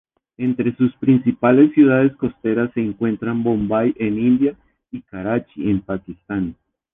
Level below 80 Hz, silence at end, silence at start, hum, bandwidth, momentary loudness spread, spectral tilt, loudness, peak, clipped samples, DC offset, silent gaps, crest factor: -50 dBFS; 0.4 s; 0.4 s; none; 3.8 kHz; 15 LU; -11.5 dB/octave; -19 LUFS; -2 dBFS; under 0.1%; under 0.1%; none; 16 dB